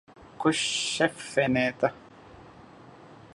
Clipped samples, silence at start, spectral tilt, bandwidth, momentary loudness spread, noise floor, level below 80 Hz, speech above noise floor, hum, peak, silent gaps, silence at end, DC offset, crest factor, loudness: under 0.1%; 0.2 s; -3.5 dB/octave; 11.5 kHz; 4 LU; -50 dBFS; -62 dBFS; 24 dB; none; -6 dBFS; none; 0.1 s; under 0.1%; 22 dB; -26 LUFS